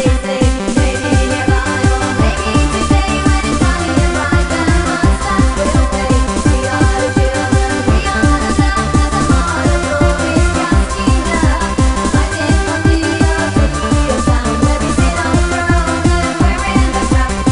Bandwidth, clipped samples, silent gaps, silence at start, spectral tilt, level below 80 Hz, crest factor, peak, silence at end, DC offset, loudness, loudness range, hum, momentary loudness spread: 11 kHz; under 0.1%; none; 0 s; -5.5 dB/octave; -16 dBFS; 12 dB; 0 dBFS; 0 s; under 0.1%; -13 LUFS; 0 LU; none; 1 LU